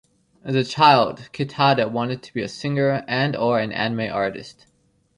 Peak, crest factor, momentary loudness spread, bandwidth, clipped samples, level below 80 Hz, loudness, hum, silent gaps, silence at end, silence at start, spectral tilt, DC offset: -2 dBFS; 20 dB; 14 LU; 10.5 kHz; under 0.1%; -60 dBFS; -21 LUFS; none; none; 0.65 s; 0.45 s; -6 dB/octave; under 0.1%